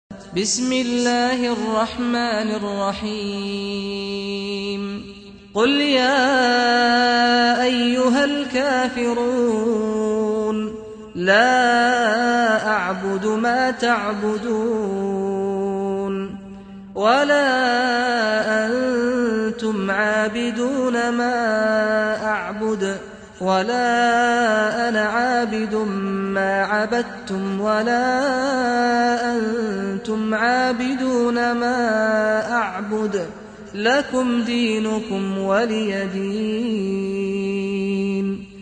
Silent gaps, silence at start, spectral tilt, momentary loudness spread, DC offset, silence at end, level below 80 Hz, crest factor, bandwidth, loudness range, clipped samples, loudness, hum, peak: none; 0.1 s; -4 dB/octave; 9 LU; under 0.1%; 0 s; -54 dBFS; 16 dB; 9.4 kHz; 5 LU; under 0.1%; -20 LUFS; none; -2 dBFS